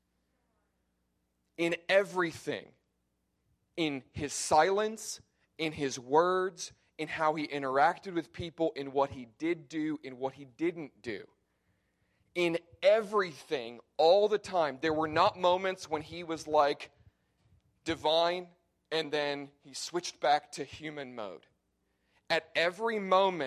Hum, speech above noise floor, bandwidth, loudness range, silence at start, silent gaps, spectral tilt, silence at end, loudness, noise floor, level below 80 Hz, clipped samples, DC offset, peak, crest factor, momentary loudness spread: none; 48 dB; 14.5 kHz; 6 LU; 1.6 s; none; -4 dB/octave; 0 s; -31 LUFS; -79 dBFS; -66 dBFS; under 0.1%; under 0.1%; -12 dBFS; 20 dB; 15 LU